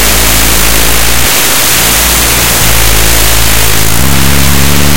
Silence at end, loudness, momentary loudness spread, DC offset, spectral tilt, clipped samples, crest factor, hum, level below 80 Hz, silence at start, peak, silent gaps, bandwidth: 0 s; -5 LUFS; 2 LU; 30%; -2 dB/octave; 7%; 8 dB; none; -14 dBFS; 0 s; 0 dBFS; none; over 20 kHz